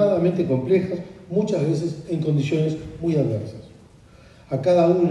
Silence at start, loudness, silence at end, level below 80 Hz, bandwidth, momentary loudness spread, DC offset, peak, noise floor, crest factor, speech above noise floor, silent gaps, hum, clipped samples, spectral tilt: 0 s; -22 LUFS; 0 s; -52 dBFS; 10.5 kHz; 12 LU; under 0.1%; -6 dBFS; -49 dBFS; 16 dB; 28 dB; none; none; under 0.1%; -8.5 dB/octave